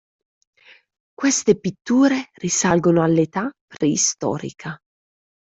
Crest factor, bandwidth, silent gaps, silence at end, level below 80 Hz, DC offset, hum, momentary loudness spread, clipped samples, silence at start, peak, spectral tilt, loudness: 18 dB; 8.4 kHz; 3.61-3.68 s; 0.8 s; -60 dBFS; under 0.1%; none; 14 LU; under 0.1%; 1.2 s; -2 dBFS; -4.5 dB/octave; -19 LUFS